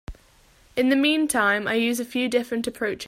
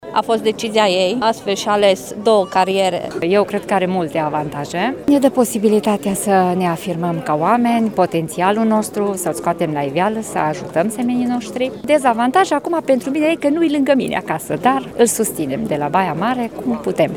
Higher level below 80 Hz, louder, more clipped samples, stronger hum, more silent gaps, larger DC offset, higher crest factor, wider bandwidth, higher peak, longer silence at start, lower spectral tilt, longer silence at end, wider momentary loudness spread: about the same, -50 dBFS vs -54 dBFS; second, -23 LUFS vs -17 LUFS; neither; neither; neither; second, under 0.1% vs 0.1%; about the same, 16 dB vs 16 dB; second, 16 kHz vs 19 kHz; second, -8 dBFS vs 0 dBFS; about the same, 0.1 s vs 0 s; second, -3 dB/octave vs -5 dB/octave; about the same, 0 s vs 0 s; about the same, 8 LU vs 6 LU